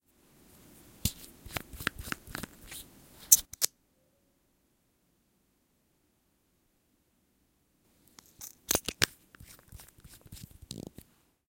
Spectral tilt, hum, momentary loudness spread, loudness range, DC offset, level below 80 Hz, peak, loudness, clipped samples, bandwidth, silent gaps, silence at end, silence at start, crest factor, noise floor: -1 dB/octave; none; 29 LU; 10 LU; under 0.1%; -56 dBFS; -2 dBFS; -30 LUFS; under 0.1%; 17 kHz; none; 0.65 s; 1.05 s; 36 dB; -73 dBFS